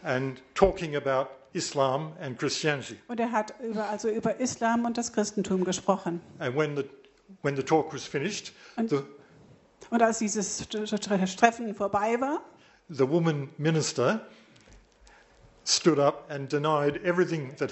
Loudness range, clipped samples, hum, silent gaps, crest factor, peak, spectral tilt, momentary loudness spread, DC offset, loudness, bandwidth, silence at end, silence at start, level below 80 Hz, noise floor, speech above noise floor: 3 LU; under 0.1%; none; none; 26 dB; -4 dBFS; -4.5 dB/octave; 9 LU; under 0.1%; -28 LUFS; 8.2 kHz; 0 s; 0 s; -56 dBFS; -57 dBFS; 29 dB